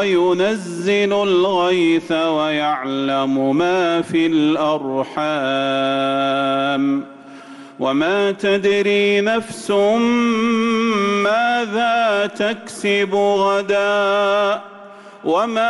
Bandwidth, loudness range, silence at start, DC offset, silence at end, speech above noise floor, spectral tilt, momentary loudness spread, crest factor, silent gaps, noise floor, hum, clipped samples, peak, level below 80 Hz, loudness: 11.5 kHz; 2 LU; 0 s; under 0.1%; 0 s; 22 dB; -5 dB/octave; 5 LU; 10 dB; none; -39 dBFS; none; under 0.1%; -8 dBFS; -60 dBFS; -17 LUFS